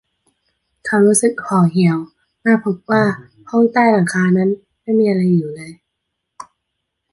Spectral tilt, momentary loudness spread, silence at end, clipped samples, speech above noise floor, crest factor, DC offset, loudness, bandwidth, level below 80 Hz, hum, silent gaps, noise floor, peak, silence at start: -6 dB/octave; 16 LU; 0.7 s; under 0.1%; 61 dB; 16 dB; under 0.1%; -16 LUFS; 11.5 kHz; -60 dBFS; none; none; -75 dBFS; -2 dBFS; 0.85 s